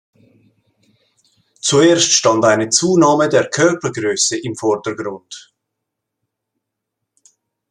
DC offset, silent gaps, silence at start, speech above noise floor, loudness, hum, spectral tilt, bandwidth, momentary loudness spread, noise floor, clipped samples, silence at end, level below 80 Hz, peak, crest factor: under 0.1%; none; 1.65 s; 64 dB; -14 LUFS; none; -3 dB/octave; 11.5 kHz; 15 LU; -78 dBFS; under 0.1%; 2.3 s; -60 dBFS; 0 dBFS; 18 dB